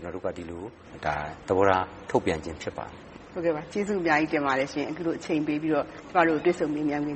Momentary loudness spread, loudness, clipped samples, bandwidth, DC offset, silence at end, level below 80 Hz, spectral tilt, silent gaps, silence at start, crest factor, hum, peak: 15 LU; -27 LUFS; under 0.1%; 8.4 kHz; under 0.1%; 0 s; -54 dBFS; -6 dB/octave; none; 0 s; 20 dB; none; -6 dBFS